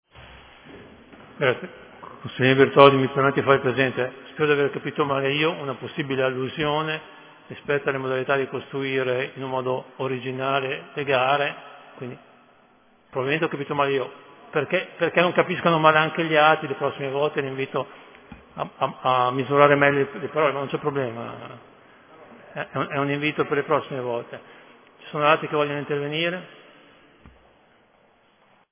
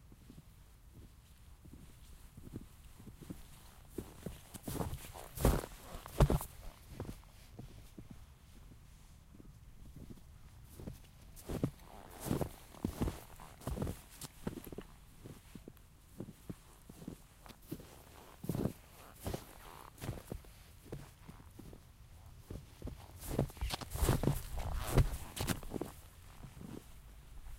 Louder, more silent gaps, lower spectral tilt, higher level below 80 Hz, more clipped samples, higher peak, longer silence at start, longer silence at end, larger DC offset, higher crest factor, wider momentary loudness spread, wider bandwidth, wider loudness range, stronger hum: first, -23 LUFS vs -42 LUFS; neither; first, -9.5 dB/octave vs -5.5 dB/octave; second, -62 dBFS vs -46 dBFS; neither; first, 0 dBFS vs -14 dBFS; first, 0.15 s vs 0 s; first, 2.2 s vs 0 s; neither; about the same, 24 dB vs 28 dB; second, 17 LU vs 23 LU; second, 4 kHz vs 16 kHz; second, 7 LU vs 17 LU; neither